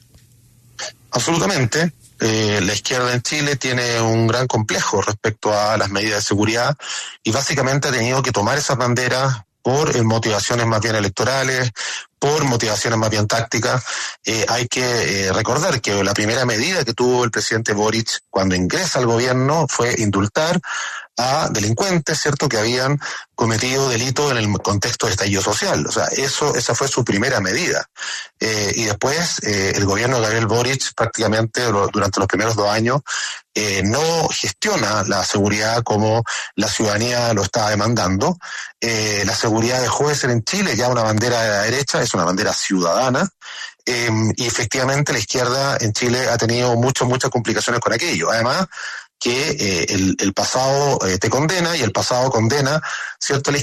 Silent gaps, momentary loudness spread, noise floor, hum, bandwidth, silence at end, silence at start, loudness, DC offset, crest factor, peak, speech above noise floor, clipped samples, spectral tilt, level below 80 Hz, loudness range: none; 4 LU; -50 dBFS; none; 13.5 kHz; 0 s; 0.8 s; -18 LUFS; under 0.1%; 14 dB; -4 dBFS; 32 dB; under 0.1%; -4 dB/octave; -50 dBFS; 1 LU